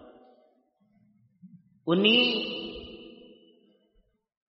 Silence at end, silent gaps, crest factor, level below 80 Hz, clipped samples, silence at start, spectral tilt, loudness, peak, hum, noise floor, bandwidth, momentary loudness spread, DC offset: 1.4 s; none; 22 dB; -64 dBFS; under 0.1%; 1.45 s; -2 dB/octave; -24 LUFS; -10 dBFS; none; -69 dBFS; 5.8 kHz; 24 LU; under 0.1%